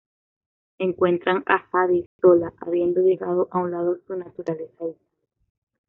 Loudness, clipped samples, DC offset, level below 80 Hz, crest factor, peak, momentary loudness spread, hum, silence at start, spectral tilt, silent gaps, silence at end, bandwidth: -22 LUFS; under 0.1%; under 0.1%; -66 dBFS; 20 dB; -2 dBFS; 13 LU; none; 0.8 s; -5.5 dB/octave; 2.06-2.19 s; 0.95 s; 4.1 kHz